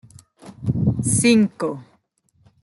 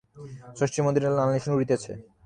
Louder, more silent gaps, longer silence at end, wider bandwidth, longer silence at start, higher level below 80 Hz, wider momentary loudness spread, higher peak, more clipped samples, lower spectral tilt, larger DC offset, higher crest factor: first, -19 LUFS vs -25 LUFS; neither; first, 0.8 s vs 0.25 s; first, 12 kHz vs 10 kHz; first, 0.45 s vs 0.15 s; first, -48 dBFS vs -60 dBFS; second, 13 LU vs 19 LU; first, -6 dBFS vs -10 dBFS; neither; second, -5 dB/octave vs -6.5 dB/octave; neither; about the same, 16 dB vs 16 dB